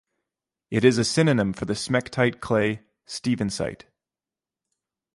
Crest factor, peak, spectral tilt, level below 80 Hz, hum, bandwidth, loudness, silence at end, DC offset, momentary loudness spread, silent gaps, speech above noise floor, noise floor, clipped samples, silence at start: 22 dB; -4 dBFS; -5.5 dB/octave; -54 dBFS; none; 11.5 kHz; -24 LUFS; 1.4 s; under 0.1%; 10 LU; none; over 67 dB; under -90 dBFS; under 0.1%; 0.7 s